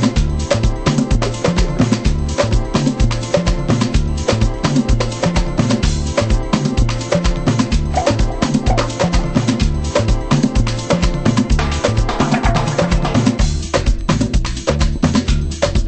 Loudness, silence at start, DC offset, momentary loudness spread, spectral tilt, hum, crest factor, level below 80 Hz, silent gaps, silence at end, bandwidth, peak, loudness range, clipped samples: -17 LUFS; 0 s; under 0.1%; 2 LU; -5.5 dB/octave; none; 14 dB; -20 dBFS; none; 0 s; 8.8 kHz; 0 dBFS; 1 LU; under 0.1%